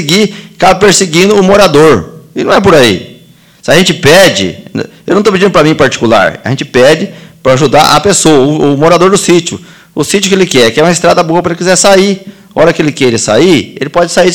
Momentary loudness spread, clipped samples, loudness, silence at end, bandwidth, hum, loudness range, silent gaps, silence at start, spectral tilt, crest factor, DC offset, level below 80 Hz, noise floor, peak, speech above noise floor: 11 LU; 4%; -6 LUFS; 0 s; 19.5 kHz; none; 2 LU; none; 0 s; -4 dB/octave; 6 dB; 1%; -36 dBFS; -38 dBFS; 0 dBFS; 32 dB